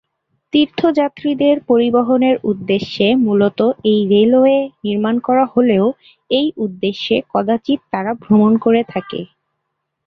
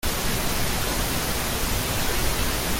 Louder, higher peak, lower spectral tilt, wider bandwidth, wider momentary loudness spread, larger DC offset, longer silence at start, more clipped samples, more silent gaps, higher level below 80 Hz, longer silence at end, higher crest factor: first, -15 LUFS vs -24 LUFS; first, -2 dBFS vs -10 dBFS; first, -8 dB/octave vs -3 dB/octave; second, 6.2 kHz vs 17 kHz; first, 8 LU vs 1 LU; neither; first, 0.55 s vs 0.05 s; neither; neither; second, -56 dBFS vs -30 dBFS; first, 0.8 s vs 0 s; about the same, 14 dB vs 14 dB